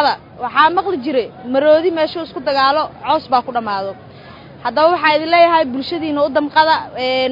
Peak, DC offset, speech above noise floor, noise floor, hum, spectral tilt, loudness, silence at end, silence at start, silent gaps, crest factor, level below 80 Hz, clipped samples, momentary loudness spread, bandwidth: 0 dBFS; under 0.1%; 22 dB; -37 dBFS; none; -6 dB/octave; -15 LUFS; 0 s; 0 s; none; 16 dB; -56 dBFS; under 0.1%; 9 LU; 5.4 kHz